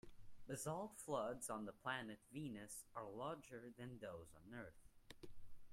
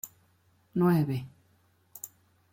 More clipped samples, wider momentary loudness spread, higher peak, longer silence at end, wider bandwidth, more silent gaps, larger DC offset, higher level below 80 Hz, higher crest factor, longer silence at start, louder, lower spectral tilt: neither; second, 16 LU vs 22 LU; second, -32 dBFS vs -14 dBFS; second, 0 s vs 0.45 s; about the same, 16 kHz vs 16.5 kHz; neither; neither; about the same, -72 dBFS vs -68 dBFS; about the same, 20 dB vs 18 dB; about the same, 0.05 s vs 0.05 s; second, -51 LUFS vs -28 LUFS; second, -4.5 dB/octave vs -7.5 dB/octave